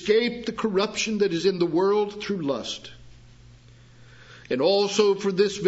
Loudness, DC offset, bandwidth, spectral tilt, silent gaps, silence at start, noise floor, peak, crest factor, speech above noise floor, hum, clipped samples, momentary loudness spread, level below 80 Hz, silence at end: -24 LUFS; under 0.1%; 8 kHz; -4.5 dB/octave; none; 0 s; -50 dBFS; -8 dBFS; 18 dB; 27 dB; none; under 0.1%; 9 LU; -58 dBFS; 0 s